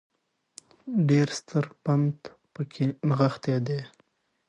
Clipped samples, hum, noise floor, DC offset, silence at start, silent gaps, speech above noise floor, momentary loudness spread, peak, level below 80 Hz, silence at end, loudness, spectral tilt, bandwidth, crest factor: under 0.1%; none; -68 dBFS; under 0.1%; 0.85 s; none; 42 dB; 17 LU; -8 dBFS; -70 dBFS; 0.6 s; -27 LUFS; -7 dB/octave; 10.5 kHz; 18 dB